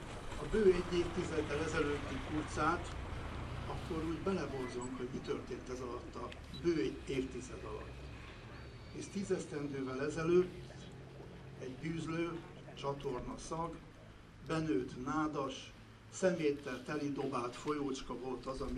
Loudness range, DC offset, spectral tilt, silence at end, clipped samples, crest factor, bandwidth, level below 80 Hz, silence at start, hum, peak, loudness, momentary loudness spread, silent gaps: 4 LU; under 0.1%; -6 dB/octave; 0 s; under 0.1%; 20 dB; 12 kHz; -52 dBFS; 0 s; none; -18 dBFS; -39 LUFS; 17 LU; none